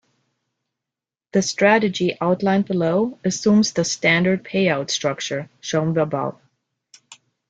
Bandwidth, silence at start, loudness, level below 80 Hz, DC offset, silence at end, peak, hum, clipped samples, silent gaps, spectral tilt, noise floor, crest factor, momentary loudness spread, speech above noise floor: 9 kHz; 1.35 s; -20 LUFS; -60 dBFS; under 0.1%; 0.35 s; -2 dBFS; none; under 0.1%; none; -4.5 dB/octave; -88 dBFS; 18 dB; 8 LU; 68 dB